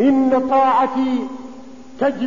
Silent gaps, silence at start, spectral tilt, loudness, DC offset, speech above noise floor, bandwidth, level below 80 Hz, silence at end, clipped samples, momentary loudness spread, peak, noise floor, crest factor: none; 0 s; -6.5 dB/octave; -17 LUFS; 0.9%; 21 dB; 7.4 kHz; -56 dBFS; 0 s; under 0.1%; 17 LU; -6 dBFS; -38 dBFS; 12 dB